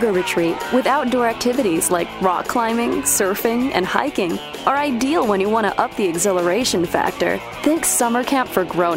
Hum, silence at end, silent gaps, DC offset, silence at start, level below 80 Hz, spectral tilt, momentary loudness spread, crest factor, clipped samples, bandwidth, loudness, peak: none; 0 s; none; under 0.1%; 0 s; -48 dBFS; -3.5 dB/octave; 3 LU; 18 dB; under 0.1%; 16.5 kHz; -18 LUFS; 0 dBFS